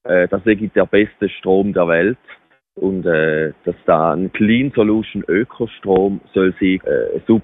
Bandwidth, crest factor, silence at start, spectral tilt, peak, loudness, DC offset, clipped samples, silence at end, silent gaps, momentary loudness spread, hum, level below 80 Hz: 4 kHz; 14 dB; 0.05 s; -10.5 dB/octave; -2 dBFS; -17 LUFS; under 0.1%; under 0.1%; 0 s; none; 7 LU; none; -48 dBFS